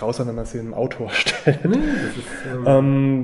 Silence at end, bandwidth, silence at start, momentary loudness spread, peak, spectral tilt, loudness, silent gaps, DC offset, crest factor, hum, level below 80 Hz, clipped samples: 0 s; 11.5 kHz; 0 s; 13 LU; -2 dBFS; -6 dB/octave; -20 LUFS; none; under 0.1%; 18 dB; none; -40 dBFS; under 0.1%